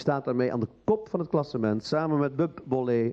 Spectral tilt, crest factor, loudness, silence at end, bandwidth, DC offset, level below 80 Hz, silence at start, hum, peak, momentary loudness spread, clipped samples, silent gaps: -8 dB/octave; 16 dB; -28 LUFS; 0 s; 8.2 kHz; under 0.1%; -64 dBFS; 0 s; none; -12 dBFS; 3 LU; under 0.1%; none